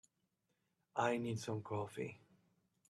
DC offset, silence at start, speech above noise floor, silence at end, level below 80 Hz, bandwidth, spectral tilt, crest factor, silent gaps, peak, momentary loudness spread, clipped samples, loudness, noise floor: under 0.1%; 0.95 s; 44 dB; 0.7 s; -80 dBFS; 13 kHz; -6 dB/octave; 22 dB; none; -22 dBFS; 9 LU; under 0.1%; -42 LUFS; -85 dBFS